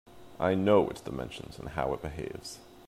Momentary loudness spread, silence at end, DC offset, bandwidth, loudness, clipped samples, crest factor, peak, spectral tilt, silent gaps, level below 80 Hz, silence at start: 17 LU; 0 s; under 0.1%; 15.5 kHz; -31 LUFS; under 0.1%; 20 dB; -10 dBFS; -6.5 dB/octave; none; -52 dBFS; 0.05 s